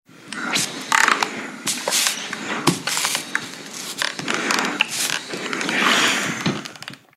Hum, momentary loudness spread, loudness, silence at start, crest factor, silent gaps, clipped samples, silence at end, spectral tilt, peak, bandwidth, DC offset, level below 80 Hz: none; 13 LU; -21 LUFS; 0.15 s; 22 dB; none; under 0.1%; 0.2 s; -1.5 dB/octave; -2 dBFS; 16 kHz; under 0.1%; -66 dBFS